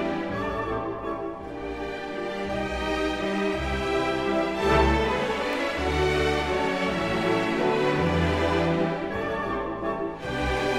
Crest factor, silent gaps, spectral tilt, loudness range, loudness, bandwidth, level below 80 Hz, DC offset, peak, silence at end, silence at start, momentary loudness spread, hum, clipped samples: 18 dB; none; -6 dB/octave; 5 LU; -26 LUFS; 15 kHz; -38 dBFS; 0.1%; -8 dBFS; 0 s; 0 s; 8 LU; none; under 0.1%